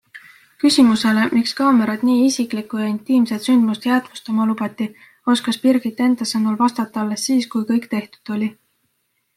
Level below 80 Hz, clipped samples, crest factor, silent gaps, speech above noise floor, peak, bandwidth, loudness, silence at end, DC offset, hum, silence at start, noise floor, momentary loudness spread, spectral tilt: -64 dBFS; under 0.1%; 16 dB; none; 51 dB; -4 dBFS; 14 kHz; -18 LUFS; 0.85 s; under 0.1%; none; 0.15 s; -69 dBFS; 9 LU; -4.5 dB/octave